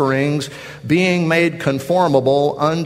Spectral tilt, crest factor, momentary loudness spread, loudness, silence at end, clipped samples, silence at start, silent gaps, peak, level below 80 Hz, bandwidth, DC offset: -6 dB/octave; 16 dB; 8 LU; -16 LUFS; 0 s; under 0.1%; 0 s; none; 0 dBFS; -54 dBFS; 15.5 kHz; under 0.1%